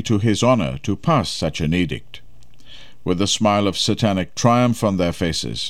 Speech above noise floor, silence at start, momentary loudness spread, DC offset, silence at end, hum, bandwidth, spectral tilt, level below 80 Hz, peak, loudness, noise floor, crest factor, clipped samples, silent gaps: 30 dB; 0 s; 7 LU; 2%; 0 s; none; 14.5 kHz; -5 dB/octave; -42 dBFS; -2 dBFS; -19 LUFS; -49 dBFS; 16 dB; under 0.1%; none